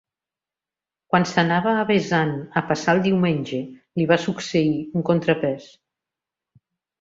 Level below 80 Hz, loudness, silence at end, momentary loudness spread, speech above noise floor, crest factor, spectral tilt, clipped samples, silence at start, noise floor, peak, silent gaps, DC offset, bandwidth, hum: -60 dBFS; -21 LUFS; 1.35 s; 7 LU; 69 dB; 20 dB; -6 dB/octave; under 0.1%; 1.1 s; -90 dBFS; -2 dBFS; none; under 0.1%; 7.8 kHz; none